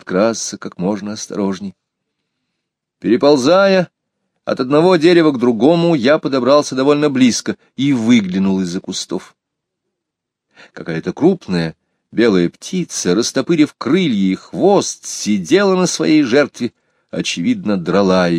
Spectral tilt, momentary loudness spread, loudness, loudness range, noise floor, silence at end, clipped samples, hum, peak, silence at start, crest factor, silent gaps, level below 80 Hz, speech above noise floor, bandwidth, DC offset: -5 dB/octave; 13 LU; -15 LUFS; 7 LU; -79 dBFS; 0 s; under 0.1%; none; 0 dBFS; 0.05 s; 16 dB; none; -58 dBFS; 65 dB; 13 kHz; under 0.1%